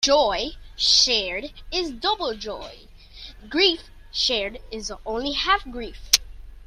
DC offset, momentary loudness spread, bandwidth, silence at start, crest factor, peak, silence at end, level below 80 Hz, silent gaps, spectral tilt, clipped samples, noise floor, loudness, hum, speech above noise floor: under 0.1%; 18 LU; 16 kHz; 0 s; 24 dB; 0 dBFS; 0 s; -42 dBFS; none; -1 dB/octave; under 0.1%; -43 dBFS; -22 LUFS; none; 19 dB